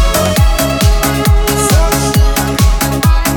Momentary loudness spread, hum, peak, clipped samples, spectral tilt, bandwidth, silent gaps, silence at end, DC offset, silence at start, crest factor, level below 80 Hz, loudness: 1 LU; none; 0 dBFS; under 0.1%; -4.5 dB/octave; over 20 kHz; none; 0 s; under 0.1%; 0 s; 10 dB; -12 dBFS; -11 LUFS